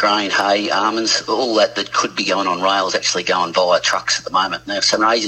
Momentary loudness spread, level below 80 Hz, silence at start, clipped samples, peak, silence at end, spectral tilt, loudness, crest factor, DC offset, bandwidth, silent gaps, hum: 3 LU; -58 dBFS; 0 s; under 0.1%; -2 dBFS; 0 s; -1.5 dB/octave; -17 LUFS; 16 dB; under 0.1%; 13 kHz; none; none